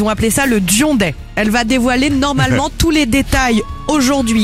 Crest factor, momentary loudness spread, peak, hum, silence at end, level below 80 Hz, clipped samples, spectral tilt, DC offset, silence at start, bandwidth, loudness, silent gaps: 12 dB; 4 LU; 0 dBFS; none; 0 s; -26 dBFS; under 0.1%; -4 dB/octave; under 0.1%; 0 s; 16 kHz; -13 LUFS; none